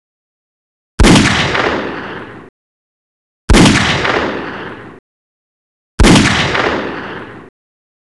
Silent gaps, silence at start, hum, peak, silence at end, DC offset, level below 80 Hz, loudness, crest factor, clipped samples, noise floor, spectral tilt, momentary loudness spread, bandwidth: 2.49-3.48 s, 4.99-5.98 s; 1 s; none; 0 dBFS; 0.65 s; under 0.1%; -22 dBFS; -11 LUFS; 14 dB; under 0.1%; under -90 dBFS; -4.5 dB/octave; 25 LU; 12.5 kHz